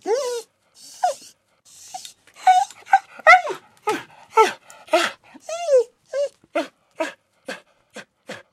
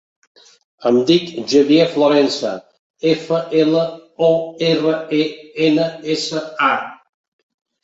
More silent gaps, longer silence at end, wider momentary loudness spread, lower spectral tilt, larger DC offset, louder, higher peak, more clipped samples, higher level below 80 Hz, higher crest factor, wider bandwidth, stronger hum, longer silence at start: second, none vs 2.79-2.94 s; second, 0.15 s vs 0.9 s; first, 23 LU vs 9 LU; second, -1.5 dB/octave vs -5.5 dB/octave; neither; second, -20 LUFS vs -17 LUFS; about the same, 0 dBFS vs -2 dBFS; neither; second, -76 dBFS vs -62 dBFS; first, 22 dB vs 16 dB; first, 15 kHz vs 8 kHz; neither; second, 0.05 s vs 0.8 s